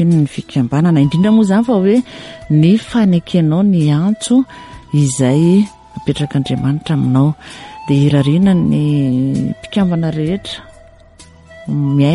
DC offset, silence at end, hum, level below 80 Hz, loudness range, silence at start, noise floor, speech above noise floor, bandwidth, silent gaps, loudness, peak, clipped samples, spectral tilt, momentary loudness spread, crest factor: under 0.1%; 0 s; none; -44 dBFS; 3 LU; 0 s; -41 dBFS; 29 dB; 11.5 kHz; none; -14 LUFS; -2 dBFS; under 0.1%; -7 dB/octave; 11 LU; 12 dB